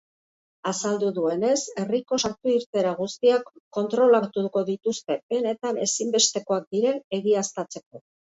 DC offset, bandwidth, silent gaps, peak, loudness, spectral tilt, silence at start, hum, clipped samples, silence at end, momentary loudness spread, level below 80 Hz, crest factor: under 0.1%; 8 kHz; 2.66-2.73 s, 3.60-3.71 s, 5.23-5.29 s, 6.67-6.71 s, 7.04-7.11 s, 7.86-7.91 s; -8 dBFS; -24 LUFS; -3.5 dB/octave; 0.65 s; none; under 0.1%; 0.4 s; 9 LU; -70 dBFS; 18 dB